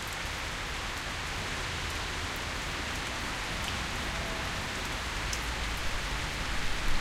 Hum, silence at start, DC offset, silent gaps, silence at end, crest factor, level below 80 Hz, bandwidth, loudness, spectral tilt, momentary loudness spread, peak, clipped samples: none; 0 s; under 0.1%; none; 0 s; 16 dB; -40 dBFS; 16.5 kHz; -34 LUFS; -3 dB/octave; 2 LU; -18 dBFS; under 0.1%